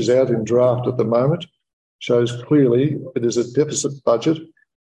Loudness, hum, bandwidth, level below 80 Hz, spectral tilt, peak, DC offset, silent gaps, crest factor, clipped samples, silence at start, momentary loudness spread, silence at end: -19 LUFS; none; 11.5 kHz; -60 dBFS; -6 dB/octave; -4 dBFS; under 0.1%; 1.73-1.99 s; 14 dB; under 0.1%; 0 s; 6 LU; 0.45 s